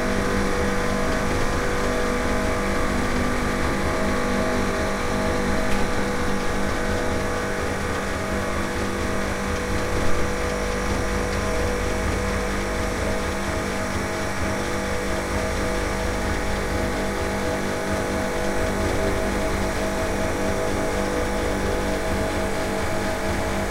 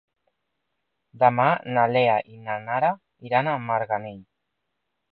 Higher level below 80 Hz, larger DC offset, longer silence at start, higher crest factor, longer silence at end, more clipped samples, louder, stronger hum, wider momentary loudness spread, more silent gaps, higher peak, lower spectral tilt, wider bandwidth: first, -30 dBFS vs -70 dBFS; neither; second, 0 s vs 1.15 s; second, 16 dB vs 22 dB; second, 0 s vs 0.9 s; neither; about the same, -24 LUFS vs -23 LUFS; neither; second, 2 LU vs 12 LU; neither; about the same, -6 dBFS vs -4 dBFS; second, -5 dB/octave vs -10 dB/octave; first, 16 kHz vs 5 kHz